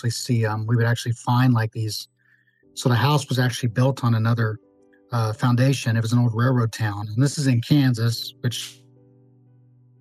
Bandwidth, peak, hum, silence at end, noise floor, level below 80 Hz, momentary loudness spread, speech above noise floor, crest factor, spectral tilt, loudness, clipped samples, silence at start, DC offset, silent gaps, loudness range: 13.5 kHz; -4 dBFS; none; 1.3 s; -61 dBFS; -66 dBFS; 9 LU; 41 dB; 18 dB; -6 dB/octave; -22 LUFS; under 0.1%; 0.05 s; under 0.1%; none; 2 LU